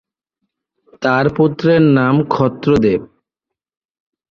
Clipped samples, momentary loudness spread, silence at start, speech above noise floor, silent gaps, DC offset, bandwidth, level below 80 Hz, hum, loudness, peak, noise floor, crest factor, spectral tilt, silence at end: under 0.1%; 6 LU; 1 s; 70 dB; none; under 0.1%; 7.2 kHz; -46 dBFS; none; -14 LUFS; -2 dBFS; -83 dBFS; 14 dB; -8.5 dB/octave; 1.25 s